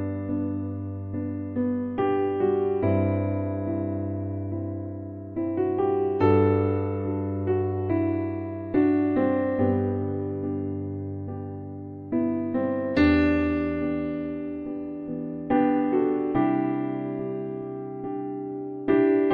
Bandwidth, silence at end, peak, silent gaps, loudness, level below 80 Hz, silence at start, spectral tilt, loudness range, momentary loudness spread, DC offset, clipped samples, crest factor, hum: 4.9 kHz; 0 s; -8 dBFS; none; -26 LUFS; -50 dBFS; 0 s; -10.5 dB/octave; 3 LU; 12 LU; under 0.1%; under 0.1%; 16 dB; none